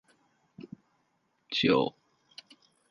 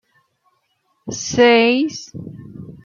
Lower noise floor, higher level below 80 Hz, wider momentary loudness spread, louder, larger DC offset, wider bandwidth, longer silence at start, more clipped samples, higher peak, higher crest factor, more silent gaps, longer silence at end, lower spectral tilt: first, -75 dBFS vs -66 dBFS; second, -72 dBFS vs -56 dBFS; about the same, 26 LU vs 25 LU; second, -28 LUFS vs -15 LUFS; neither; first, 10.5 kHz vs 7.4 kHz; second, 0.6 s vs 1.05 s; neither; second, -10 dBFS vs -2 dBFS; first, 24 dB vs 18 dB; neither; first, 1 s vs 0.15 s; first, -5.5 dB/octave vs -3.5 dB/octave